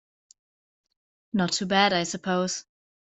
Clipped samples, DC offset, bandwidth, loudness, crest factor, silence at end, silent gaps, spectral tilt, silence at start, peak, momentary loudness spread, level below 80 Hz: under 0.1%; under 0.1%; 8.2 kHz; -25 LUFS; 24 dB; 0.6 s; none; -3.5 dB/octave; 1.35 s; -4 dBFS; 10 LU; -66 dBFS